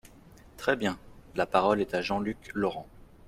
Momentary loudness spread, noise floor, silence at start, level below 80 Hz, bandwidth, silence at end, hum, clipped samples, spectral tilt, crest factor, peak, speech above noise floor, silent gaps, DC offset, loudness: 11 LU; -53 dBFS; 0.55 s; -56 dBFS; 15.5 kHz; 0.25 s; none; under 0.1%; -5.5 dB/octave; 24 dB; -8 dBFS; 25 dB; none; under 0.1%; -30 LUFS